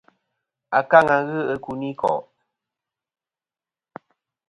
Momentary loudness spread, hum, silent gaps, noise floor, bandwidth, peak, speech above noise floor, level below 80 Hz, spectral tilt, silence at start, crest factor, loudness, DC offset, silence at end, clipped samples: 13 LU; none; none; under -90 dBFS; 10.5 kHz; 0 dBFS; over 71 dB; -62 dBFS; -7 dB/octave; 0.7 s; 24 dB; -20 LUFS; under 0.1%; 2.3 s; under 0.1%